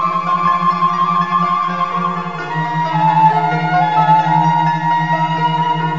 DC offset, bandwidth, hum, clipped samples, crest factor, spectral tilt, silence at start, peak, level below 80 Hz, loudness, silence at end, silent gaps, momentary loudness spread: 1%; 7.6 kHz; none; under 0.1%; 14 dB; -4.5 dB/octave; 0 s; 0 dBFS; -58 dBFS; -15 LUFS; 0 s; none; 6 LU